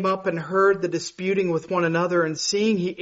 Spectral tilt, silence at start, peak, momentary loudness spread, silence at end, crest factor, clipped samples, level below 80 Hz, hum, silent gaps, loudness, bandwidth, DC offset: -4.5 dB/octave; 0 s; -10 dBFS; 5 LU; 0 s; 14 dB; under 0.1%; -64 dBFS; none; none; -23 LUFS; 8 kHz; under 0.1%